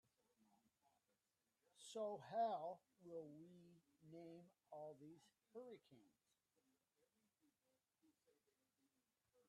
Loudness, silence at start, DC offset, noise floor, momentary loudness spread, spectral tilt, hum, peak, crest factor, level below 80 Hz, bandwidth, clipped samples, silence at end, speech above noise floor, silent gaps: -52 LUFS; 1.75 s; under 0.1%; under -90 dBFS; 20 LU; -5 dB/octave; none; -34 dBFS; 22 dB; under -90 dBFS; 11.5 kHz; under 0.1%; 3.4 s; over 38 dB; none